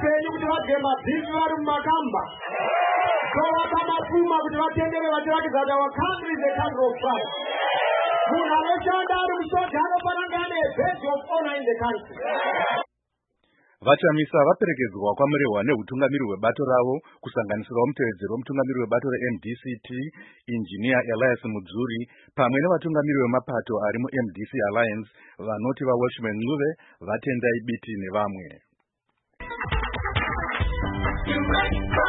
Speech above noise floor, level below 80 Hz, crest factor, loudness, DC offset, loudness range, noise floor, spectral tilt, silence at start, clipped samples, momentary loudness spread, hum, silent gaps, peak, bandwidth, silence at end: 54 dB; -42 dBFS; 20 dB; -24 LUFS; under 0.1%; 5 LU; -79 dBFS; -10.5 dB/octave; 0 s; under 0.1%; 9 LU; none; none; -4 dBFS; 4.1 kHz; 0 s